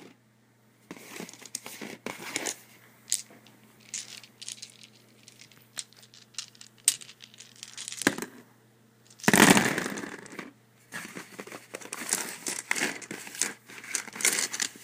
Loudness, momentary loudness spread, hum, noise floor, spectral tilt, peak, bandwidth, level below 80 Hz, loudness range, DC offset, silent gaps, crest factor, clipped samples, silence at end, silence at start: -28 LUFS; 19 LU; none; -63 dBFS; -2 dB/octave; 0 dBFS; 16 kHz; -70 dBFS; 12 LU; under 0.1%; none; 32 dB; under 0.1%; 0 s; 0 s